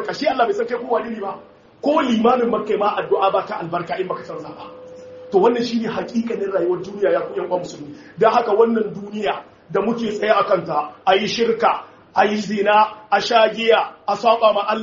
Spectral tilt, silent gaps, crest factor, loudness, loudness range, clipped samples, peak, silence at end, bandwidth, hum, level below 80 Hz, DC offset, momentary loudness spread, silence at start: -3 dB/octave; none; 18 dB; -19 LUFS; 4 LU; under 0.1%; -2 dBFS; 0 s; 7.4 kHz; none; -62 dBFS; under 0.1%; 13 LU; 0 s